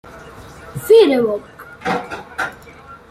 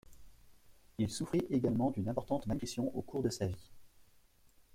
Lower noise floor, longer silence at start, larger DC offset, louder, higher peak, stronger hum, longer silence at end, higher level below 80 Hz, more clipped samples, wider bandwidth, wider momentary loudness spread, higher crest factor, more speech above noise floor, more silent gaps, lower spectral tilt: second, -40 dBFS vs -65 dBFS; about the same, 0.05 s vs 0.1 s; neither; first, -16 LUFS vs -36 LUFS; first, -2 dBFS vs -20 dBFS; neither; about the same, 0.15 s vs 0.15 s; first, -50 dBFS vs -60 dBFS; neither; about the same, 15.5 kHz vs 16 kHz; first, 27 LU vs 6 LU; about the same, 16 dB vs 18 dB; second, 26 dB vs 30 dB; neither; second, -5 dB/octave vs -6.5 dB/octave